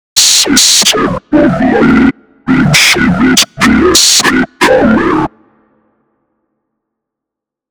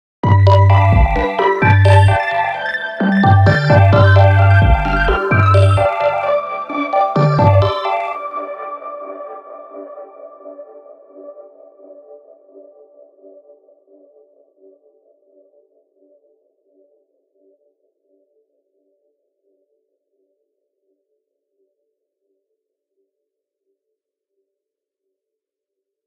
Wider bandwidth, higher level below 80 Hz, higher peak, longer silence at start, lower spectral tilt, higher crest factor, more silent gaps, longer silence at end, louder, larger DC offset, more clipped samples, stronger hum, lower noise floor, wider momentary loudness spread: first, over 20 kHz vs 8.6 kHz; about the same, -32 dBFS vs -30 dBFS; about the same, 0 dBFS vs 0 dBFS; about the same, 0.15 s vs 0.25 s; second, -2.5 dB/octave vs -8 dB/octave; second, 10 dB vs 16 dB; neither; second, 2.45 s vs 14.15 s; first, -7 LUFS vs -13 LUFS; neither; first, 0.8% vs under 0.1%; neither; about the same, -81 dBFS vs -83 dBFS; second, 8 LU vs 24 LU